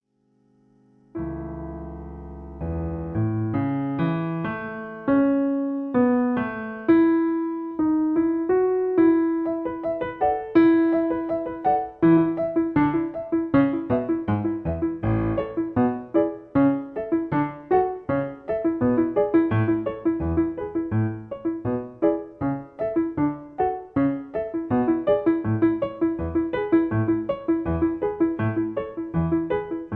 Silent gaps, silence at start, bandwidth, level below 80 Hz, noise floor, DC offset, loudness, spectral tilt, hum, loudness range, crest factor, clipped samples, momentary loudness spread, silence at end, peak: none; 1.15 s; 4 kHz; -46 dBFS; -65 dBFS; under 0.1%; -24 LUFS; -11.5 dB/octave; none; 5 LU; 18 dB; under 0.1%; 9 LU; 0 s; -6 dBFS